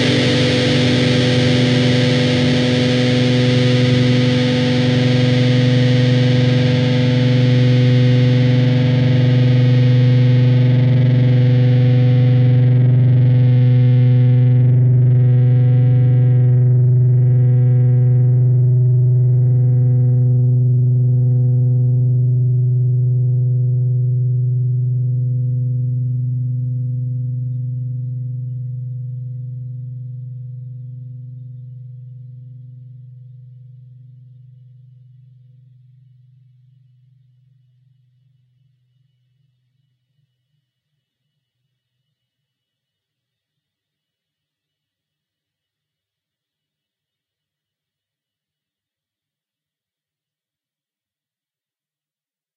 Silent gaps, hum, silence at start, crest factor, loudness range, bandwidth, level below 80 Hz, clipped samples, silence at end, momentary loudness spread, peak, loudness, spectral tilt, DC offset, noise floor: none; none; 0 s; 12 dB; 14 LU; 7.2 kHz; -48 dBFS; under 0.1%; 19.25 s; 14 LU; -4 dBFS; -14 LUFS; -7.5 dB/octave; under 0.1%; under -90 dBFS